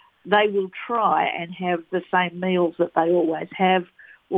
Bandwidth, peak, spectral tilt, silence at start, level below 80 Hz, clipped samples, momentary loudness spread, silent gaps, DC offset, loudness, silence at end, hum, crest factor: 4.1 kHz; -2 dBFS; -8.5 dB/octave; 0.25 s; -70 dBFS; under 0.1%; 6 LU; none; under 0.1%; -22 LUFS; 0 s; none; 20 dB